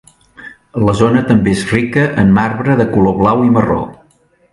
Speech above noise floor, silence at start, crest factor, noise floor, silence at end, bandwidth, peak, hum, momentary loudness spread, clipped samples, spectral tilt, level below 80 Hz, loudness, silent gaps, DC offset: 41 dB; 0.4 s; 12 dB; -53 dBFS; 0.6 s; 11.5 kHz; 0 dBFS; none; 6 LU; under 0.1%; -7.5 dB/octave; -36 dBFS; -12 LUFS; none; under 0.1%